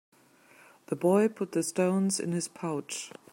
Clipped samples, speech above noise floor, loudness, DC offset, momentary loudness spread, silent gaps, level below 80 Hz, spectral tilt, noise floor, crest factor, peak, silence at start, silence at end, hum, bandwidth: under 0.1%; 30 dB; -29 LUFS; under 0.1%; 12 LU; none; -78 dBFS; -5 dB/octave; -59 dBFS; 18 dB; -14 dBFS; 0.9 s; 0.25 s; none; 16.5 kHz